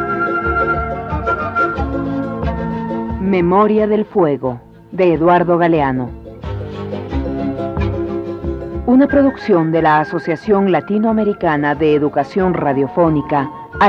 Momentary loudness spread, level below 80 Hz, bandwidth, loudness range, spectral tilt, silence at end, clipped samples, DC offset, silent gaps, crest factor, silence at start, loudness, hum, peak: 11 LU; -32 dBFS; 6.8 kHz; 4 LU; -9 dB/octave; 0 s; under 0.1%; under 0.1%; none; 12 dB; 0 s; -16 LUFS; none; -2 dBFS